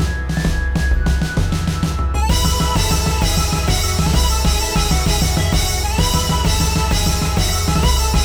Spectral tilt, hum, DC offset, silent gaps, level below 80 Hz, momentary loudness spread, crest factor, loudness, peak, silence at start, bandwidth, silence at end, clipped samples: -4 dB/octave; none; 0.2%; none; -18 dBFS; 3 LU; 14 dB; -17 LUFS; -2 dBFS; 0 s; over 20 kHz; 0 s; under 0.1%